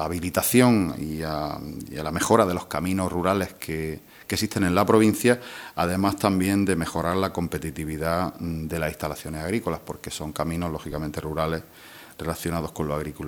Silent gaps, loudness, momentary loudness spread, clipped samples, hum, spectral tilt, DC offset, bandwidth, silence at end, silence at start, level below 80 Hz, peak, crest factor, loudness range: none; -25 LUFS; 13 LU; under 0.1%; none; -5.5 dB/octave; under 0.1%; over 20 kHz; 0 s; 0 s; -46 dBFS; -2 dBFS; 22 dB; 7 LU